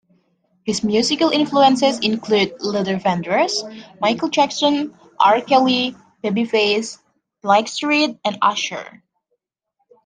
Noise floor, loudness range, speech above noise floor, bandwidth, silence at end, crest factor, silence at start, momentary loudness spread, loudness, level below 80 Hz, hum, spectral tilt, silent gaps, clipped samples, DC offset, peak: -73 dBFS; 2 LU; 55 dB; 10 kHz; 1.15 s; 18 dB; 0.65 s; 11 LU; -18 LUFS; -62 dBFS; none; -4 dB/octave; none; under 0.1%; under 0.1%; -2 dBFS